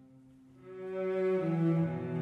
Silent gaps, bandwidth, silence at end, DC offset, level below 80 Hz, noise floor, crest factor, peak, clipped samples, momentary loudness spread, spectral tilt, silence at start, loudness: none; 4.4 kHz; 0 s; under 0.1%; -76 dBFS; -58 dBFS; 14 dB; -20 dBFS; under 0.1%; 14 LU; -10 dB/octave; 0.15 s; -32 LUFS